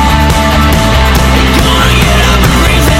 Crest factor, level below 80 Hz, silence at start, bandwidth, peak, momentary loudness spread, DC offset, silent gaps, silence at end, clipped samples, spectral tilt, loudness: 6 dB; -10 dBFS; 0 s; 16.5 kHz; 0 dBFS; 1 LU; under 0.1%; none; 0 s; 1%; -4.5 dB/octave; -7 LUFS